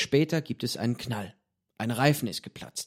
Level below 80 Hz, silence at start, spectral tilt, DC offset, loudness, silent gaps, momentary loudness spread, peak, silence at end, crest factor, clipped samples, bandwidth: -64 dBFS; 0 s; -5 dB/octave; under 0.1%; -29 LUFS; none; 12 LU; -8 dBFS; 0 s; 22 dB; under 0.1%; 16 kHz